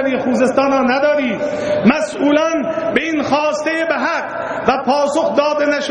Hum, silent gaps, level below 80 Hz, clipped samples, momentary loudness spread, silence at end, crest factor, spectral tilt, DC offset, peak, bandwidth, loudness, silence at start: none; none; -52 dBFS; under 0.1%; 5 LU; 0 s; 16 dB; -5 dB/octave; under 0.1%; 0 dBFS; 9.6 kHz; -16 LUFS; 0 s